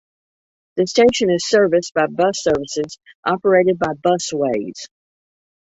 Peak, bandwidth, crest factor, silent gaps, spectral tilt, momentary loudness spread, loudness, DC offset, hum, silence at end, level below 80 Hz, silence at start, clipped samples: -2 dBFS; 8.2 kHz; 16 dB; 3.15-3.23 s; -4.5 dB/octave; 13 LU; -18 LUFS; under 0.1%; none; 0.9 s; -54 dBFS; 0.75 s; under 0.1%